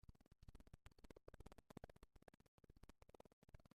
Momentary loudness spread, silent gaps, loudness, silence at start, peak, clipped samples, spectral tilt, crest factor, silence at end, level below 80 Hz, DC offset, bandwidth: 6 LU; 2.48-2.58 s, 3.33-3.42 s; -67 LUFS; 0.05 s; -40 dBFS; under 0.1%; -6 dB/octave; 24 dB; 0.05 s; -70 dBFS; under 0.1%; 13.5 kHz